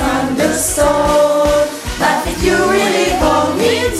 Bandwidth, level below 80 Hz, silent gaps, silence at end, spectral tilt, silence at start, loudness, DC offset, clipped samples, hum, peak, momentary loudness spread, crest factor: 16 kHz; -28 dBFS; none; 0 s; -3.5 dB/octave; 0 s; -13 LUFS; under 0.1%; under 0.1%; none; 0 dBFS; 4 LU; 12 dB